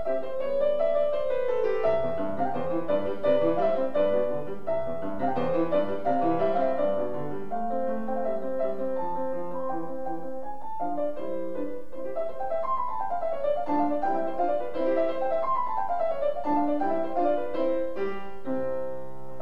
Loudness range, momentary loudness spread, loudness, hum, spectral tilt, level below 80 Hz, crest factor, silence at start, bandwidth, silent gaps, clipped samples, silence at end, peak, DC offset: 6 LU; 9 LU; -28 LUFS; none; -8 dB/octave; -56 dBFS; 14 dB; 0 s; 6.6 kHz; none; under 0.1%; 0 s; -12 dBFS; 3%